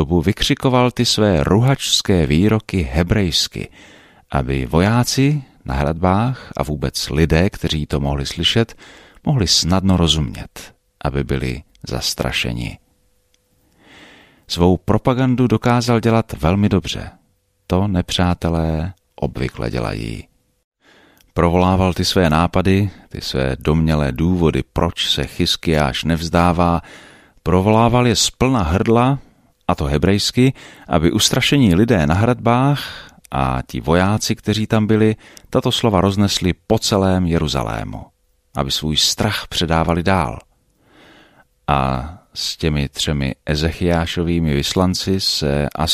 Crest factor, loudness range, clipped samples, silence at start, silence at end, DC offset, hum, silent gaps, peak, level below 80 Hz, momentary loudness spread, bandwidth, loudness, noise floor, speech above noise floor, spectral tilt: 16 dB; 5 LU; under 0.1%; 0 s; 0 s; under 0.1%; none; 20.64-20.72 s; -2 dBFS; -32 dBFS; 11 LU; 15.5 kHz; -17 LUFS; -62 dBFS; 45 dB; -5 dB/octave